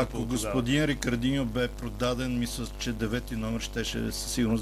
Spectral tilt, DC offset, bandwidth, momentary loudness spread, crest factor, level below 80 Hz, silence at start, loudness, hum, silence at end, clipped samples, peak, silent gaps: -5 dB/octave; under 0.1%; 15 kHz; 6 LU; 18 dB; -40 dBFS; 0 s; -30 LUFS; none; 0 s; under 0.1%; -12 dBFS; none